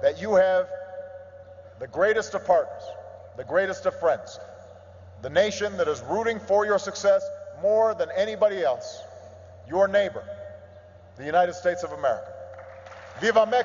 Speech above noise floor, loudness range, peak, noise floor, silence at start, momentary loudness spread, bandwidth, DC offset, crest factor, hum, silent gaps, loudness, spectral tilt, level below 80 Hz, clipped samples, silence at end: 25 dB; 3 LU; -8 dBFS; -48 dBFS; 0 s; 20 LU; 7.6 kHz; under 0.1%; 18 dB; none; none; -24 LUFS; -4 dB/octave; -66 dBFS; under 0.1%; 0 s